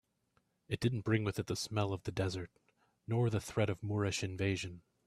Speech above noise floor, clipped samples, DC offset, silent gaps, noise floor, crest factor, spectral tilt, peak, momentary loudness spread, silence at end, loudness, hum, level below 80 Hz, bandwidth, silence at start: 42 dB; under 0.1%; under 0.1%; none; -78 dBFS; 20 dB; -5.5 dB/octave; -18 dBFS; 9 LU; 0.25 s; -37 LUFS; none; -64 dBFS; 14 kHz; 0.7 s